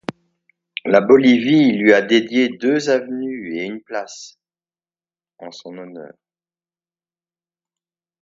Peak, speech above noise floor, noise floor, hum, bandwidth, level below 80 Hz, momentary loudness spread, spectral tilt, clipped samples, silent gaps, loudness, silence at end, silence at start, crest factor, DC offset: 0 dBFS; over 74 dB; under -90 dBFS; none; 7.8 kHz; -66 dBFS; 23 LU; -5.5 dB/octave; under 0.1%; none; -16 LUFS; 2.15 s; 0.85 s; 20 dB; under 0.1%